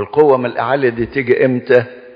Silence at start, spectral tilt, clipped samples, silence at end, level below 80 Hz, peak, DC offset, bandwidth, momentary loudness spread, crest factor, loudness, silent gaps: 0 s; -9 dB/octave; under 0.1%; 0.05 s; -48 dBFS; 0 dBFS; under 0.1%; 5.2 kHz; 5 LU; 14 dB; -14 LUFS; none